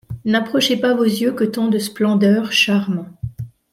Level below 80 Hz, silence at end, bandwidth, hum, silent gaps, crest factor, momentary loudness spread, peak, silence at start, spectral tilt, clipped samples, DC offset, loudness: -50 dBFS; 0.25 s; 15.5 kHz; none; none; 14 dB; 14 LU; -4 dBFS; 0.1 s; -5 dB/octave; under 0.1%; under 0.1%; -17 LUFS